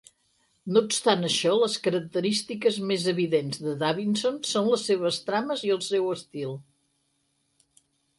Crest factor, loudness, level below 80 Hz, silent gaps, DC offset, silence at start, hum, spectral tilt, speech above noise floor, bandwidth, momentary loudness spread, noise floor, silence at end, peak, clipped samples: 20 dB; -26 LUFS; -74 dBFS; none; under 0.1%; 0.65 s; none; -4 dB/octave; 47 dB; 11.5 kHz; 8 LU; -73 dBFS; 1.55 s; -8 dBFS; under 0.1%